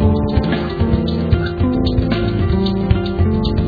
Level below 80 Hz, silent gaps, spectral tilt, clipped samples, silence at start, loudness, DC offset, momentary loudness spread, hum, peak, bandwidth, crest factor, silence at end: -22 dBFS; none; -10 dB/octave; under 0.1%; 0 s; -17 LUFS; under 0.1%; 2 LU; none; 0 dBFS; 4.9 kHz; 14 dB; 0 s